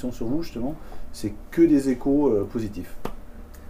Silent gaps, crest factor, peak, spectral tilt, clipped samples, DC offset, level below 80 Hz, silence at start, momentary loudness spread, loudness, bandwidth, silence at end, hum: none; 16 dB; -8 dBFS; -7.5 dB/octave; under 0.1%; under 0.1%; -40 dBFS; 0 s; 19 LU; -24 LUFS; 15.5 kHz; 0 s; none